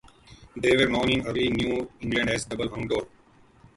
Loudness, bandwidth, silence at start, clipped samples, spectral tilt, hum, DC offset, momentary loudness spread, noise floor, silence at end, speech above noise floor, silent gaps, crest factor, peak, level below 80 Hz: -25 LUFS; 11.5 kHz; 0.3 s; under 0.1%; -5 dB/octave; none; under 0.1%; 9 LU; -57 dBFS; 0.7 s; 31 dB; none; 18 dB; -8 dBFS; -48 dBFS